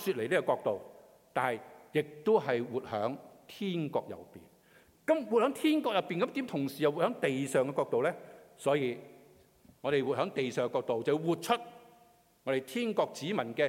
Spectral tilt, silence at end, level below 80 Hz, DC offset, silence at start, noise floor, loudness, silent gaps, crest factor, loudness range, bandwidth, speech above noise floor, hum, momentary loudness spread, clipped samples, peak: -5.5 dB/octave; 0 s; -78 dBFS; under 0.1%; 0 s; -64 dBFS; -32 LUFS; none; 18 dB; 3 LU; 16.5 kHz; 32 dB; none; 10 LU; under 0.1%; -14 dBFS